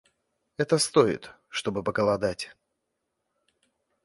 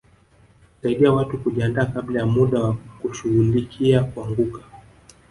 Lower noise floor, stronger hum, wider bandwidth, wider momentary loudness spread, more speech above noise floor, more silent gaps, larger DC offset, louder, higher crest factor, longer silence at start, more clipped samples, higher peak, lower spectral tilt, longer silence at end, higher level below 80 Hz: first, -80 dBFS vs -54 dBFS; neither; about the same, 12 kHz vs 11.5 kHz; first, 15 LU vs 10 LU; first, 55 dB vs 34 dB; neither; neither; second, -26 LUFS vs -21 LUFS; about the same, 22 dB vs 18 dB; second, 0.6 s vs 0.85 s; neither; about the same, -6 dBFS vs -4 dBFS; second, -4 dB/octave vs -8 dB/octave; first, 1.55 s vs 0.5 s; second, -60 dBFS vs -46 dBFS